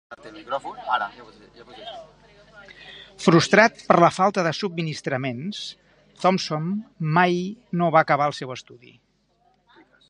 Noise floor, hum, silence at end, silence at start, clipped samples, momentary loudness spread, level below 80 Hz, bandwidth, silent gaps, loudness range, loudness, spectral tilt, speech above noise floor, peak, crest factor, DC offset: -64 dBFS; none; 1.35 s; 0.1 s; under 0.1%; 23 LU; -64 dBFS; 10.5 kHz; none; 4 LU; -22 LUFS; -5.5 dB/octave; 42 dB; 0 dBFS; 24 dB; under 0.1%